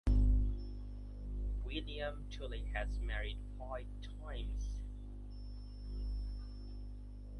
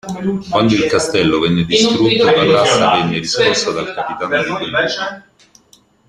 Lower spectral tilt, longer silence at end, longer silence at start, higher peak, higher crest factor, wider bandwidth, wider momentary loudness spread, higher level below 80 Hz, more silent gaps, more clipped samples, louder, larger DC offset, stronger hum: first, -7 dB/octave vs -4 dB/octave; second, 0 s vs 0.9 s; about the same, 0.05 s vs 0.05 s; second, -22 dBFS vs 0 dBFS; about the same, 18 dB vs 14 dB; second, 6.4 kHz vs 12.5 kHz; about the same, 12 LU vs 10 LU; first, -40 dBFS vs -46 dBFS; neither; neither; second, -43 LUFS vs -14 LUFS; neither; first, 50 Hz at -45 dBFS vs none